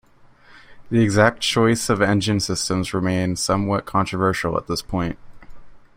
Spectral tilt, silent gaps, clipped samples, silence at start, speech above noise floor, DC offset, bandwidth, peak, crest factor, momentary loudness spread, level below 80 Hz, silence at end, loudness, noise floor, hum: -5 dB/octave; none; under 0.1%; 0.5 s; 30 dB; under 0.1%; 16 kHz; -2 dBFS; 20 dB; 8 LU; -46 dBFS; 0.2 s; -20 LUFS; -50 dBFS; none